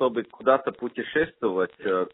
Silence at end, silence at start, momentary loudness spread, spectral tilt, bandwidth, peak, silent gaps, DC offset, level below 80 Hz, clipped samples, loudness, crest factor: 0.05 s; 0 s; 6 LU; -3.5 dB/octave; 4 kHz; -6 dBFS; none; under 0.1%; -62 dBFS; under 0.1%; -26 LUFS; 20 dB